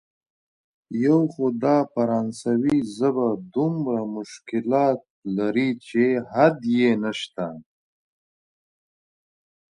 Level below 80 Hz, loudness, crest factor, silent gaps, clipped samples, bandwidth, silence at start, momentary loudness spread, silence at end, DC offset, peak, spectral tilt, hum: -66 dBFS; -23 LUFS; 20 dB; 5.10-5.22 s; under 0.1%; 11 kHz; 0.9 s; 10 LU; 2.1 s; under 0.1%; -4 dBFS; -7 dB/octave; none